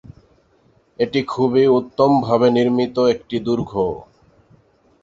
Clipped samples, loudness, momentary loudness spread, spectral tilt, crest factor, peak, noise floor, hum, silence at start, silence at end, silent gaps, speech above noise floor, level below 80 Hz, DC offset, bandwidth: under 0.1%; -18 LUFS; 8 LU; -7.5 dB/octave; 18 dB; -2 dBFS; -57 dBFS; none; 0.1 s; 1 s; none; 40 dB; -52 dBFS; under 0.1%; 7.6 kHz